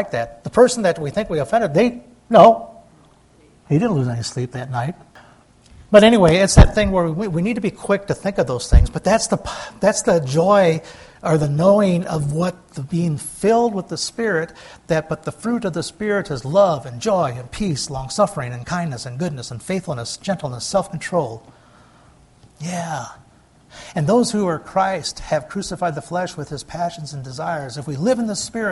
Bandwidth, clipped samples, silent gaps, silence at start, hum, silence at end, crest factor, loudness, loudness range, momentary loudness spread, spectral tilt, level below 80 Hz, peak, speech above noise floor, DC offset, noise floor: 11.5 kHz; under 0.1%; none; 0 s; none; 0 s; 18 dB; -19 LUFS; 9 LU; 14 LU; -5.5 dB/octave; -30 dBFS; 0 dBFS; 33 dB; under 0.1%; -52 dBFS